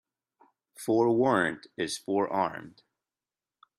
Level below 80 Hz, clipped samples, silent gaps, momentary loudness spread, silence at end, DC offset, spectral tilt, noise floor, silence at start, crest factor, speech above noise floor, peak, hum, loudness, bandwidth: -72 dBFS; under 0.1%; none; 11 LU; 1.1 s; under 0.1%; -5 dB/octave; under -90 dBFS; 0.8 s; 20 dB; over 62 dB; -10 dBFS; none; -28 LUFS; 14.5 kHz